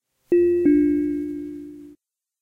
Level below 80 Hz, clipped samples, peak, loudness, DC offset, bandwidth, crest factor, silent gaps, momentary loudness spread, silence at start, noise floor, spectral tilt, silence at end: -52 dBFS; under 0.1%; -8 dBFS; -20 LUFS; under 0.1%; 2.8 kHz; 14 dB; none; 19 LU; 0.3 s; -57 dBFS; -9.5 dB/octave; 0.5 s